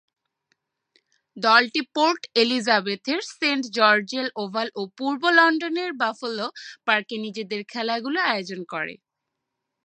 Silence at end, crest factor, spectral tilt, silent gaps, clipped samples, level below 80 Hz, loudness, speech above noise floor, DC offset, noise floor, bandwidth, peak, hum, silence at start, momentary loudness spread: 0.9 s; 22 dB; -3.5 dB/octave; none; under 0.1%; -82 dBFS; -23 LUFS; 59 dB; under 0.1%; -82 dBFS; 9.8 kHz; -2 dBFS; none; 1.35 s; 13 LU